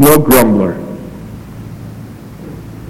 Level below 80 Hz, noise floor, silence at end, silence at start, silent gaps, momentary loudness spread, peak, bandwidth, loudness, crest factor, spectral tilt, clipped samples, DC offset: -36 dBFS; -30 dBFS; 0 s; 0 s; none; 23 LU; 0 dBFS; over 20 kHz; -10 LUFS; 14 dB; -5.5 dB/octave; 0.4%; under 0.1%